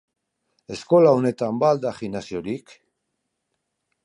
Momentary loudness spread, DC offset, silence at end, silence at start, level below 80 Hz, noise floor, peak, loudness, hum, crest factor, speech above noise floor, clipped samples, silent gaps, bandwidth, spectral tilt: 17 LU; under 0.1%; 1.45 s; 0.7 s; -62 dBFS; -78 dBFS; -4 dBFS; -21 LUFS; none; 20 dB; 57 dB; under 0.1%; none; 11 kHz; -7 dB/octave